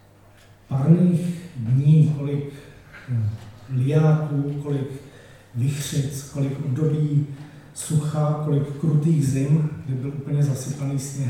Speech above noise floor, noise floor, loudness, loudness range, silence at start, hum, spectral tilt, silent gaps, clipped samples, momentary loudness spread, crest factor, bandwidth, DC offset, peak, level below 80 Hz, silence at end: 30 dB; -51 dBFS; -22 LUFS; 4 LU; 0.7 s; none; -7.5 dB/octave; none; under 0.1%; 15 LU; 18 dB; 14.5 kHz; under 0.1%; -4 dBFS; -56 dBFS; 0 s